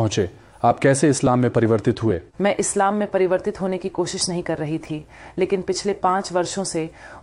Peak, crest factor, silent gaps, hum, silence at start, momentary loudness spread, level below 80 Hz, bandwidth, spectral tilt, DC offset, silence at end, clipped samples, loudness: -4 dBFS; 18 dB; none; none; 0 s; 10 LU; -50 dBFS; 11.5 kHz; -5 dB/octave; under 0.1%; 0 s; under 0.1%; -21 LUFS